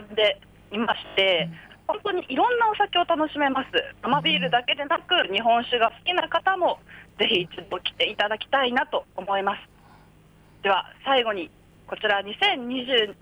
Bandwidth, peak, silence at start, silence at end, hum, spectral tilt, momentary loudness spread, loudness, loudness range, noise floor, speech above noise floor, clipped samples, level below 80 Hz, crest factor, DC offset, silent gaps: over 20 kHz; -10 dBFS; 0 s; 0.1 s; none; -5 dB/octave; 9 LU; -24 LUFS; 4 LU; -54 dBFS; 30 dB; under 0.1%; -60 dBFS; 16 dB; under 0.1%; none